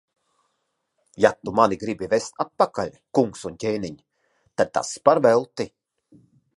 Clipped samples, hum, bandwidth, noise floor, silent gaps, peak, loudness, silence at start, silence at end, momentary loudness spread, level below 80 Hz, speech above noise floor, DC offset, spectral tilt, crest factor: under 0.1%; none; 11.5 kHz; -75 dBFS; none; -2 dBFS; -23 LUFS; 1.2 s; 0.9 s; 13 LU; -60 dBFS; 53 dB; under 0.1%; -5 dB/octave; 22 dB